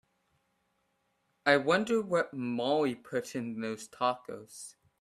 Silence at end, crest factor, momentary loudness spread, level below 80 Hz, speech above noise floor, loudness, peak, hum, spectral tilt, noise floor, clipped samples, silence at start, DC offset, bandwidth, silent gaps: 0.3 s; 24 dB; 18 LU; -76 dBFS; 46 dB; -31 LUFS; -10 dBFS; none; -4.5 dB/octave; -77 dBFS; under 0.1%; 1.45 s; under 0.1%; 14 kHz; none